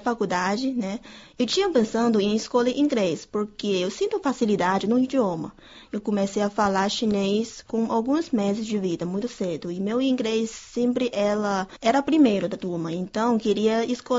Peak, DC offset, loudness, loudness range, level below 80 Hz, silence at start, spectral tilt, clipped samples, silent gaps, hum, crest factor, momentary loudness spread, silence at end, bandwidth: -8 dBFS; under 0.1%; -24 LUFS; 2 LU; -58 dBFS; 0 s; -5.5 dB/octave; under 0.1%; none; none; 16 dB; 8 LU; 0 s; 7.8 kHz